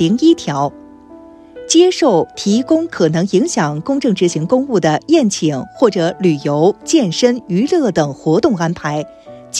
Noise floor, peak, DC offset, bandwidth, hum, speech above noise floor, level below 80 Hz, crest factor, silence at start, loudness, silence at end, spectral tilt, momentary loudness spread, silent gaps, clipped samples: -38 dBFS; 0 dBFS; under 0.1%; 11 kHz; none; 24 dB; -54 dBFS; 14 dB; 0 s; -14 LUFS; 0 s; -5 dB/octave; 7 LU; none; under 0.1%